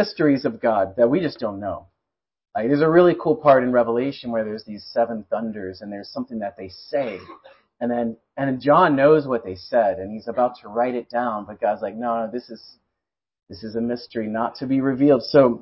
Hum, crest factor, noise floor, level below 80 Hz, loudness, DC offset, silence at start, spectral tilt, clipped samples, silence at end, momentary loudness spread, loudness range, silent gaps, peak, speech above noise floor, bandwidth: none; 18 dB; -85 dBFS; -58 dBFS; -21 LUFS; under 0.1%; 0 s; -10.5 dB/octave; under 0.1%; 0 s; 16 LU; 8 LU; none; -4 dBFS; 64 dB; 5.8 kHz